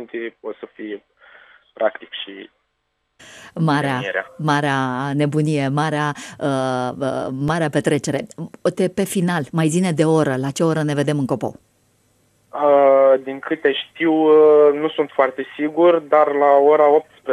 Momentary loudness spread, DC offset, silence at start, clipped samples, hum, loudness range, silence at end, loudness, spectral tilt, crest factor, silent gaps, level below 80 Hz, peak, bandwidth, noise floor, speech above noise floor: 17 LU; under 0.1%; 0 s; under 0.1%; none; 9 LU; 0 s; -18 LUFS; -6 dB/octave; 16 dB; none; -60 dBFS; -2 dBFS; 13.5 kHz; -71 dBFS; 53 dB